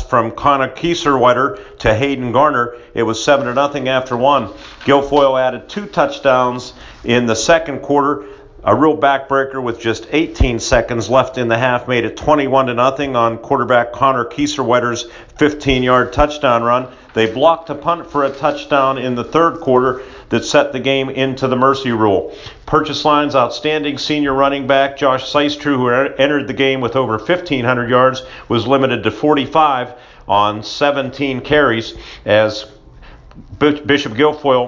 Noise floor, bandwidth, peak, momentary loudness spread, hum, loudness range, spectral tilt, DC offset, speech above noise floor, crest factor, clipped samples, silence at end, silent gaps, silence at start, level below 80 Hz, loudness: -39 dBFS; 7.6 kHz; 0 dBFS; 7 LU; none; 1 LU; -5 dB/octave; under 0.1%; 24 dB; 14 dB; under 0.1%; 0 s; none; 0 s; -36 dBFS; -15 LUFS